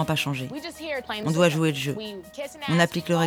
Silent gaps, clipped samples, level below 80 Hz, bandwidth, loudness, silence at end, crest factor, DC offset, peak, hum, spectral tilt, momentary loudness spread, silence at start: none; under 0.1%; -60 dBFS; 18 kHz; -25 LUFS; 0 s; 18 dB; under 0.1%; -6 dBFS; none; -5 dB/octave; 13 LU; 0 s